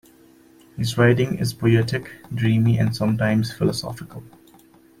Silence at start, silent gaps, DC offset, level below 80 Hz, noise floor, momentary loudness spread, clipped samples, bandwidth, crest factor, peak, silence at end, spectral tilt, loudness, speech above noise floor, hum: 0.75 s; none; under 0.1%; -52 dBFS; -52 dBFS; 16 LU; under 0.1%; 15.5 kHz; 18 dB; -4 dBFS; 0.75 s; -6.5 dB/octave; -21 LUFS; 31 dB; none